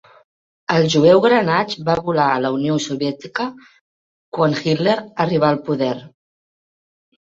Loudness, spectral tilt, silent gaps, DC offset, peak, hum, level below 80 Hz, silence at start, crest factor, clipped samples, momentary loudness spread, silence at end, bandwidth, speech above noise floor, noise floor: -18 LUFS; -6 dB/octave; 3.81-4.32 s; under 0.1%; -2 dBFS; none; -56 dBFS; 0.7 s; 18 dB; under 0.1%; 12 LU; 1.3 s; 7.8 kHz; over 73 dB; under -90 dBFS